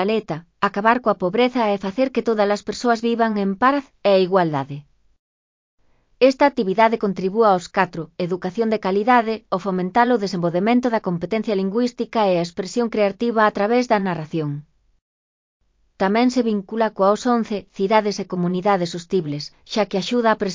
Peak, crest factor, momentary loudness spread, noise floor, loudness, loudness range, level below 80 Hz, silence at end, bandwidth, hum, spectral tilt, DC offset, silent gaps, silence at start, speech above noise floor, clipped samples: -2 dBFS; 18 dB; 7 LU; under -90 dBFS; -20 LUFS; 3 LU; -60 dBFS; 0 s; 7.6 kHz; none; -6 dB/octave; under 0.1%; 5.19-5.77 s, 15.02-15.60 s; 0 s; over 71 dB; under 0.1%